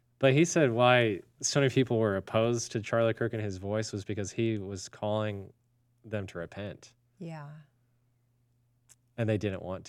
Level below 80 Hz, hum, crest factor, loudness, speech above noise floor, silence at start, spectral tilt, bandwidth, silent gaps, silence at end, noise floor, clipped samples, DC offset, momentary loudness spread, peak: -70 dBFS; none; 22 dB; -29 LUFS; 41 dB; 0.2 s; -5 dB/octave; 13.5 kHz; none; 0 s; -71 dBFS; under 0.1%; under 0.1%; 19 LU; -8 dBFS